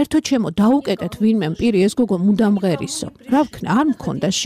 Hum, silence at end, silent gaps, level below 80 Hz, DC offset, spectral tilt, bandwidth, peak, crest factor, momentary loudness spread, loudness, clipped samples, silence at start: none; 0 s; none; -48 dBFS; under 0.1%; -5.5 dB/octave; 14.5 kHz; -8 dBFS; 10 dB; 6 LU; -18 LUFS; under 0.1%; 0 s